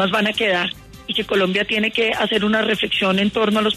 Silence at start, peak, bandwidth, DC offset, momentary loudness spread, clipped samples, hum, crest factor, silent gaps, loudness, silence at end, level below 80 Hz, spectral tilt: 0 s; -6 dBFS; 13.5 kHz; under 0.1%; 5 LU; under 0.1%; none; 12 dB; none; -18 LUFS; 0 s; -50 dBFS; -5 dB/octave